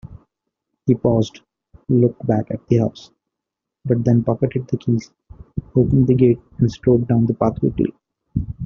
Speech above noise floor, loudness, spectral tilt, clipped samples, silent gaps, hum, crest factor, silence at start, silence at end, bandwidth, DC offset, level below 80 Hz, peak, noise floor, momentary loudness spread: 66 dB; -19 LUFS; -10 dB/octave; under 0.1%; none; none; 18 dB; 0.05 s; 0 s; 7 kHz; under 0.1%; -42 dBFS; -2 dBFS; -83 dBFS; 11 LU